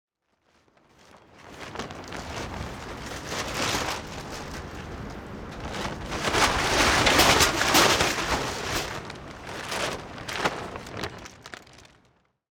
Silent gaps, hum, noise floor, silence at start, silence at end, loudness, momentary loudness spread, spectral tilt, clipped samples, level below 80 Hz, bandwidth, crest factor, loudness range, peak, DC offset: none; none; -69 dBFS; 1.15 s; 0.7 s; -25 LUFS; 20 LU; -2.5 dB/octave; under 0.1%; -44 dBFS; over 20 kHz; 24 dB; 12 LU; -4 dBFS; under 0.1%